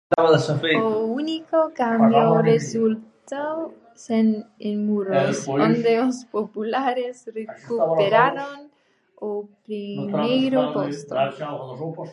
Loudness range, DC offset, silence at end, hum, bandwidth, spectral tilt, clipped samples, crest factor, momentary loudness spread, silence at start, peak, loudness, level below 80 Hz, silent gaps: 4 LU; under 0.1%; 0 s; none; 10.5 kHz; -6 dB/octave; under 0.1%; 20 dB; 15 LU; 0.1 s; -2 dBFS; -22 LUFS; -70 dBFS; none